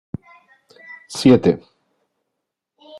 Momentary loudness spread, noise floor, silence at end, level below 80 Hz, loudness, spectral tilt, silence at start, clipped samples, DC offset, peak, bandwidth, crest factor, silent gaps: 26 LU; -79 dBFS; 1.4 s; -56 dBFS; -16 LUFS; -6.5 dB/octave; 1.1 s; under 0.1%; under 0.1%; -2 dBFS; 12 kHz; 20 dB; none